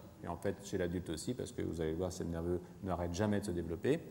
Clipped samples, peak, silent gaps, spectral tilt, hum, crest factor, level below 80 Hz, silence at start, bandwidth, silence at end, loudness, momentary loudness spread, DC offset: under 0.1%; -18 dBFS; none; -6 dB/octave; none; 20 dB; -60 dBFS; 0 s; 16.5 kHz; 0 s; -39 LUFS; 5 LU; under 0.1%